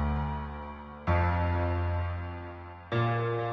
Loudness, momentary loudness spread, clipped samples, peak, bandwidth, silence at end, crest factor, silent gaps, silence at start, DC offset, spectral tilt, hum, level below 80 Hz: -31 LUFS; 13 LU; under 0.1%; -16 dBFS; 5.4 kHz; 0 s; 14 dB; none; 0 s; under 0.1%; -9.5 dB/octave; none; -40 dBFS